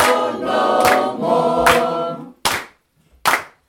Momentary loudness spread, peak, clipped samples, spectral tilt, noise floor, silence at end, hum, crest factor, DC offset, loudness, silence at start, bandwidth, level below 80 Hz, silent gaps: 8 LU; 0 dBFS; under 0.1%; -3 dB/octave; -56 dBFS; 0.2 s; none; 18 dB; under 0.1%; -17 LUFS; 0 s; over 20 kHz; -48 dBFS; none